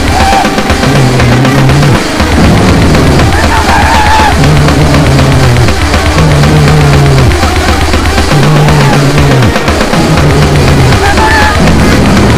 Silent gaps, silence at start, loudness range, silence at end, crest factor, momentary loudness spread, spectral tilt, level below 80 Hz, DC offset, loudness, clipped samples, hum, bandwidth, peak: none; 0 s; 1 LU; 0 s; 4 dB; 3 LU; -5.5 dB/octave; -14 dBFS; under 0.1%; -5 LUFS; 6%; none; 16 kHz; 0 dBFS